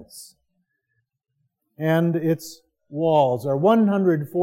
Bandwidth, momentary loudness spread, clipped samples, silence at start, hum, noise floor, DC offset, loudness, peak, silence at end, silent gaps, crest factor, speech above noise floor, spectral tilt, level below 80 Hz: 16.5 kHz; 14 LU; under 0.1%; 0 s; none; -75 dBFS; under 0.1%; -21 LUFS; -4 dBFS; 0 s; none; 18 dB; 55 dB; -7.5 dB/octave; -72 dBFS